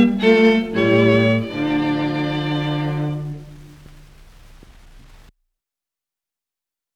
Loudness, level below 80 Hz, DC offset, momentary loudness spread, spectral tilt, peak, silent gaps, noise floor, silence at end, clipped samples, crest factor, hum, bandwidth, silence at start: -18 LUFS; -46 dBFS; under 0.1%; 11 LU; -7.5 dB/octave; -2 dBFS; none; -88 dBFS; 3.2 s; under 0.1%; 18 dB; none; 9.8 kHz; 0 s